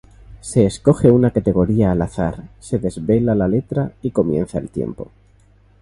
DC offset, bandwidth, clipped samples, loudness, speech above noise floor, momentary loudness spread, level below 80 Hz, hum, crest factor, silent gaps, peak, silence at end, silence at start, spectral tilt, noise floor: under 0.1%; 11.5 kHz; under 0.1%; -18 LUFS; 34 dB; 12 LU; -38 dBFS; none; 18 dB; none; 0 dBFS; 0.75 s; 0.3 s; -8 dB/octave; -51 dBFS